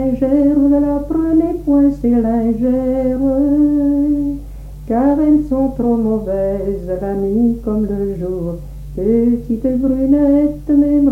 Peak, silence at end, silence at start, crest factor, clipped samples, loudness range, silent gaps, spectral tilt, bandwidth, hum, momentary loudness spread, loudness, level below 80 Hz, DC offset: -4 dBFS; 0 s; 0 s; 12 dB; under 0.1%; 4 LU; none; -10 dB/octave; 2.9 kHz; none; 9 LU; -15 LUFS; -30 dBFS; under 0.1%